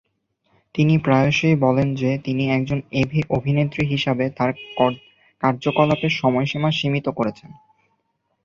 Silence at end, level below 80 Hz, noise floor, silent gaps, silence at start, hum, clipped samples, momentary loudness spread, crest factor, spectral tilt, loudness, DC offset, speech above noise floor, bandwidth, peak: 0.9 s; -50 dBFS; -71 dBFS; none; 0.75 s; none; under 0.1%; 7 LU; 18 dB; -7 dB/octave; -20 LUFS; under 0.1%; 51 dB; 7.2 kHz; -2 dBFS